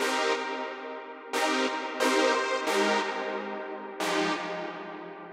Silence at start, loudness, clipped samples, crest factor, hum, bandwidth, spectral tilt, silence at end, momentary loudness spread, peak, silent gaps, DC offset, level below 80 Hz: 0 s; -29 LUFS; under 0.1%; 18 dB; none; 16 kHz; -2.5 dB/octave; 0 s; 14 LU; -12 dBFS; none; under 0.1%; -88 dBFS